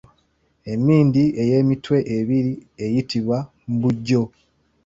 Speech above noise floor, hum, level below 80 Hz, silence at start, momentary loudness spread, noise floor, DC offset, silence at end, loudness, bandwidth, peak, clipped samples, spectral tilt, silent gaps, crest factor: 45 dB; none; -54 dBFS; 0.65 s; 11 LU; -64 dBFS; under 0.1%; 0.6 s; -20 LUFS; 7.8 kHz; -4 dBFS; under 0.1%; -8.5 dB/octave; none; 16 dB